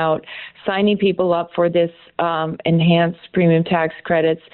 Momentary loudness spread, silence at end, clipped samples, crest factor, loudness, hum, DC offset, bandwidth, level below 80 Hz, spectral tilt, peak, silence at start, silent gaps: 8 LU; 0.15 s; under 0.1%; 12 dB; -18 LUFS; none; under 0.1%; 4.3 kHz; -56 dBFS; -5.5 dB/octave; -6 dBFS; 0 s; none